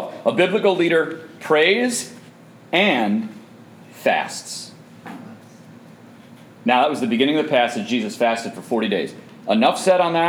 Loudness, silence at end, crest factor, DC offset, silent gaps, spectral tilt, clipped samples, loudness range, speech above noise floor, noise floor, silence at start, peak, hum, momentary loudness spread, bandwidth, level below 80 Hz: -19 LUFS; 0 s; 18 dB; under 0.1%; none; -4 dB/octave; under 0.1%; 7 LU; 26 dB; -45 dBFS; 0 s; -2 dBFS; none; 17 LU; 18 kHz; -76 dBFS